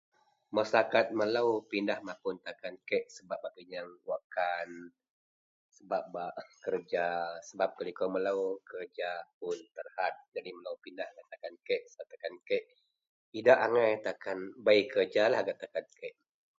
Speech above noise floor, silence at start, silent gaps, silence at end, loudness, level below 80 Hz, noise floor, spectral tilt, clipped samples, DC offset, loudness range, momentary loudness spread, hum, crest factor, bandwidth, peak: over 57 dB; 0.5 s; 4.24-4.30 s, 5.10-5.69 s, 9.34-9.41 s, 10.28-10.32 s, 13.09-13.32 s; 0.5 s; -33 LUFS; -82 dBFS; under -90 dBFS; -4.5 dB/octave; under 0.1%; under 0.1%; 10 LU; 17 LU; none; 24 dB; 7.8 kHz; -10 dBFS